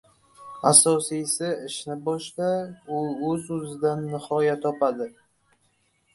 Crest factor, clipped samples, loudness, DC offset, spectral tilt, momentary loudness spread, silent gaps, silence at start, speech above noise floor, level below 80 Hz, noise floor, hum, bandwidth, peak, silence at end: 24 dB; under 0.1%; -24 LUFS; under 0.1%; -3.5 dB/octave; 16 LU; none; 0.4 s; 43 dB; -66 dBFS; -68 dBFS; none; 12 kHz; -2 dBFS; 1.05 s